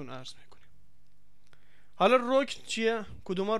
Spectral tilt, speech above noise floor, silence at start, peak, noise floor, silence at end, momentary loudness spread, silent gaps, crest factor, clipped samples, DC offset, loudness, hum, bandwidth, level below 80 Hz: -4.5 dB/octave; 39 dB; 0 s; -10 dBFS; -68 dBFS; 0 s; 19 LU; none; 20 dB; under 0.1%; 0.7%; -28 LUFS; none; 12 kHz; -64 dBFS